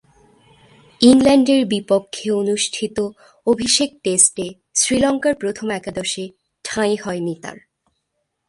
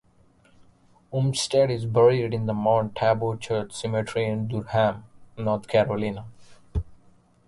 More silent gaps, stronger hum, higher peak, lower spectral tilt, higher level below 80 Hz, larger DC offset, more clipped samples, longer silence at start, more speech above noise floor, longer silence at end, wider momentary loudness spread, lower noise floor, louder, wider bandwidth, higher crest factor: neither; neither; first, 0 dBFS vs -8 dBFS; second, -3 dB/octave vs -6 dB/octave; second, -54 dBFS vs -46 dBFS; neither; neither; about the same, 1 s vs 1.1 s; first, 56 dB vs 35 dB; first, 0.95 s vs 0.5 s; about the same, 14 LU vs 14 LU; first, -74 dBFS vs -59 dBFS; first, -18 LUFS vs -25 LUFS; about the same, 11.5 kHz vs 11.5 kHz; about the same, 18 dB vs 18 dB